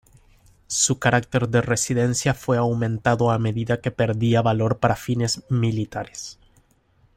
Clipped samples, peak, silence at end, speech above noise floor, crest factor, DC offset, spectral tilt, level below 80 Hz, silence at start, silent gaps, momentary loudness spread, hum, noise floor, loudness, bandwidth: under 0.1%; -4 dBFS; 0.85 s; 39 dB; 18 dB; under 0.1%; -5 dB/octave; -50 dBFS; 0.7 s; none; 8 LU; none; -60 dBFS; -22 LUFS; 15.5 kHz